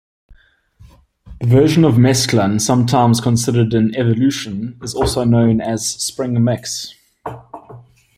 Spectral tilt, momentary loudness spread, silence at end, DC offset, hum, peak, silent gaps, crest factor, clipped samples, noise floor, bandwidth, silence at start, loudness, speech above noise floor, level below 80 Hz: -5.5 dB/octave; 20 LU; 0.35 s; under 0.1%; none; -2 dBFS; none; 14 dB; under 0.1%; -49 dBFS; 15 kHz; 1.25 s; -15 LUFS; 35 dB; -40 dBFS